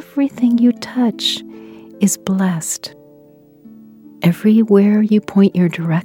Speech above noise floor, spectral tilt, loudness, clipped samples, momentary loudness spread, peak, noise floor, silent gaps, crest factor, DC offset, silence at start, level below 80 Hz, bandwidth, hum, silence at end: 32 dB; -5.5 dB/octave; -15 LUFS; under 0.1%; 10 LU; 0 dBFS; -46 dBFS; none; 16 dB; under 0.1%; 0 s; -62 dBFS; 16.5 kHz; none; 0 s